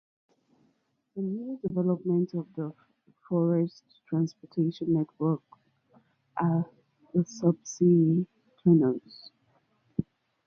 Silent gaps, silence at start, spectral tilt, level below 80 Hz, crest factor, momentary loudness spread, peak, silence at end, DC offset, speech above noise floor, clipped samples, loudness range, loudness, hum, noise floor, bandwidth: none; 1.15 s; -8.5 dB/octave; -68 dBFS; 18 dB; 15 LU; -10 dBFS; 0.45 s; under 0.1%; 45 dB; under 0.1%; 5 LU; -29 LUFS; none; -73 dBFS; 7 kHz